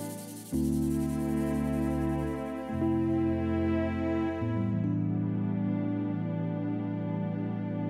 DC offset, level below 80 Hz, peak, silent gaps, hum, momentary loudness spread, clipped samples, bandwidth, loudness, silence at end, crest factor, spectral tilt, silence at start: under 0.1%; -46 dBFS; -18 dBFS; none; none; 4 LU; under 0.1%; 16 kHz; -31 LUFS; 0 s; 12 dB; -8 dB/octave; 0 s